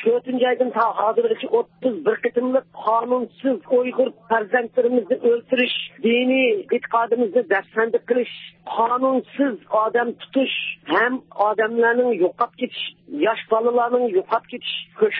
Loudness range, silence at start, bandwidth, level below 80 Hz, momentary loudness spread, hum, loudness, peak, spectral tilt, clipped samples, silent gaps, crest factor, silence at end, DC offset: 2 LU; 0 s; 4.4 kHz; -76 dBFS; 6 LU; none; -21 LUFS; -4 dBFS; -9 dB/octave; under 0.1%; none; 16 dB; 0 s; under 0.1%